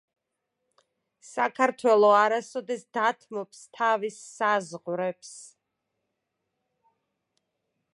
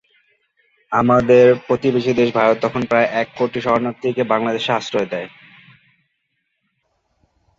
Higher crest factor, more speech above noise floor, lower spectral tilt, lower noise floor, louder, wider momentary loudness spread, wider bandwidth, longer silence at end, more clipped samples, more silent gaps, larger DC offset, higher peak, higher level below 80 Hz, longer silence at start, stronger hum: first, 22 dB vs 16 dB; about the same, 56 dB vs 55 dB; second, -4 dB/octave vs -6.5 dB/octave; first, -82 dBFS vs -71 dBFS; second, -25 LUFS vs -17 LUFS; first, 18 LU vs 10 LU; first, 11.5 kHz vs 7.6 kHz; first, 2.5 s vs 2.3 s; neither; neither; neither; second, -8 dBFS vs -2 dBFS; second, -86 dBFS vs -54 dBFS; first, 1.3 s vs 0.9 s; neither